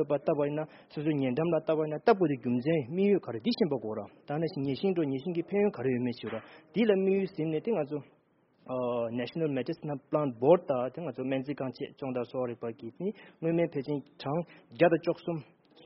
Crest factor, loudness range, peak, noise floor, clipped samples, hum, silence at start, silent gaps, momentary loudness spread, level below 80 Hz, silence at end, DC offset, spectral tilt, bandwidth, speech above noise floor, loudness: 22 dB; 5 LU; -10 dBFS; -67 dBFS; under 0.1%; none; 0 s; none; 12 LU; -72 dBFS; 0.4 s; under 0.1%; -6.5 dB/octave; 5.8 kHz; 37 dB; -31 LUFS